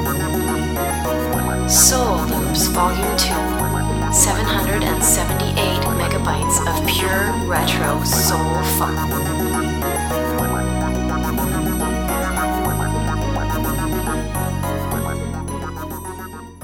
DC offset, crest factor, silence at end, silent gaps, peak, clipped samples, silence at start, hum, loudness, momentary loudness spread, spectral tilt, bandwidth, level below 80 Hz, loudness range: 0.2%; 18 dB; 0 s; none; 0 dBFS; under 0.1%; 0 s; none; -18 LUFS; 8 LU; -4 dB/octave; over 20 kHz; -28 dBFS; 5 LU